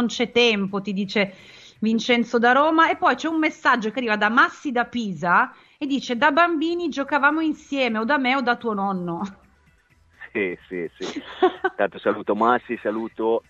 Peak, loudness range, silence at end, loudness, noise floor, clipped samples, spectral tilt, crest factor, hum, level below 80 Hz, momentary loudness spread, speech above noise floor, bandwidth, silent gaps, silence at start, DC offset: -2 dBFS; 7 LU; 0.1 s; -21 LUFS; -58 dBFS; under 0.1%; -5 dB/octave; 20 dB; none; -62 dBFS; 10 LU; 37 dB; 7.8 kHz; none; 0 s; under 0.1%